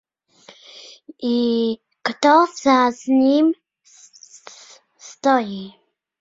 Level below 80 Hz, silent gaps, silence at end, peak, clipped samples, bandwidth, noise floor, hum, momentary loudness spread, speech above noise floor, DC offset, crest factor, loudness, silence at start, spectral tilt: -66 dBFS; none; 0.5 s; 0 dBFS; under 0.1%; 7.8 kHz; -51 dBFS; none; 25 LU; 34 dB; under 0.1%; 20 dB; -18 LUFS; 1.2 s; -4 dB/octave